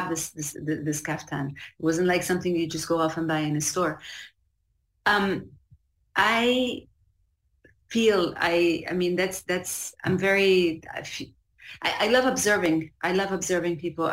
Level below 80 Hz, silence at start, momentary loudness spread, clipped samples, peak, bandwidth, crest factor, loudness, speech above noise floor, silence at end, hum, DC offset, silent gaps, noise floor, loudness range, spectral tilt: -58 dBFS; 0 s; 13 LU; under 0.1%; -8 dBFS; 16 kHz; 18 dB; -25 LUFS; 47 dB; 0 s; none; under 0.1%; none; -72 dBFS; 3 LU; -4 dB/octave